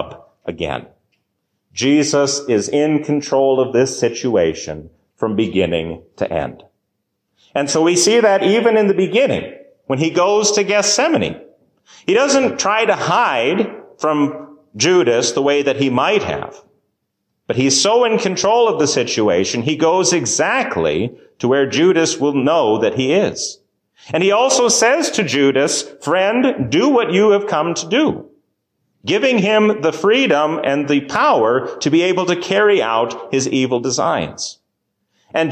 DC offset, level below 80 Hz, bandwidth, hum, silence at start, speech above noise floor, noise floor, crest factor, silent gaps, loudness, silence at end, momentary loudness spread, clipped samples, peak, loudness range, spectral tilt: under 0.1%; -50 dBFS; 15 kHz; none; 0 s; 57 dB; -73 dBFS; 14 dB; none; -15 LUFS; 0 s; 11 LU; under 0.1%; -2 dBFS; 3 LU; -3.5 dB/octave